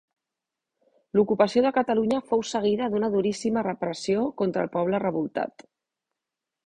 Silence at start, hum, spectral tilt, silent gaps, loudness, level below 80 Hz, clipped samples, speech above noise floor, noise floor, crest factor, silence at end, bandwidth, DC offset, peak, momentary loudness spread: 1.15 s; none; -6 dB/octave; none; -25 LUFS; -64 dBFS; under 0.1%; 62 dB; -87 dBFS; 20 dB; 1.15 s; 10.5 kHz; under 0.1%; -6 dBFS; 7 LU